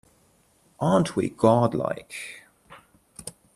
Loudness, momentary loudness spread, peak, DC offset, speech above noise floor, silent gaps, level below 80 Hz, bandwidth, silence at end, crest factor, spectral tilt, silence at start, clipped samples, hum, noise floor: -23 LUFS; 21 LU; -4 dBFS; under 0.1%; 39 dB; none; -60 dBFS; 13.5 kHz; 0.25 s; 22 dB; -6.5 dB/octave; 0.8 s; under 0.1%; none; -62 dBFS